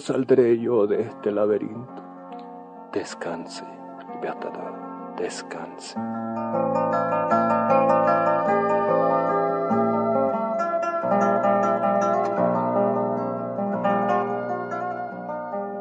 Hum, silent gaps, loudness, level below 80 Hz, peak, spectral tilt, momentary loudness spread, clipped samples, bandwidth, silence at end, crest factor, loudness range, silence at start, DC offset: none; none; -23 LUFS; -72 dBFS; -6 dBFS; -7 dB/octave; 16 LU; under 0.1%; 9.4 kHz; 0 s; 16 dB; 12 LU; 0 s; under 0.1%